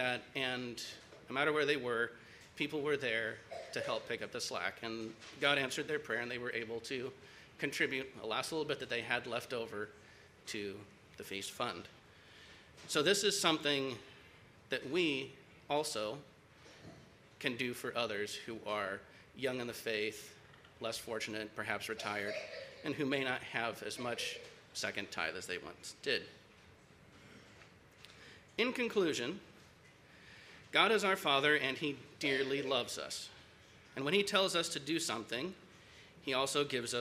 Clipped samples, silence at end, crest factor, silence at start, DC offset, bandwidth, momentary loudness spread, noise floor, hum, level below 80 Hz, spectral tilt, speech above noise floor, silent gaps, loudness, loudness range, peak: under 0.1%; 0 s; 26 dB; 0 s; under 0.1%; 15.5 kHz; 23 LU; -62 dBFS; none; -74 dBFS; -3 dB/octave; 24 dB; none; -37 LUFS; 7 LU; -12 dBFS